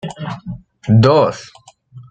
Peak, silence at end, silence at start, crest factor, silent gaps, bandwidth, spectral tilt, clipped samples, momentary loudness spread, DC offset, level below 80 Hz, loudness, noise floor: 0 dBFS; 0.1 s; 0.05 s; 16 dB; none; 8 kHz; -7.5 dB/octave; under 0.1%; 21 LU; under 0.1%; -48 dBFS; -13 LUFS; -41 dBFS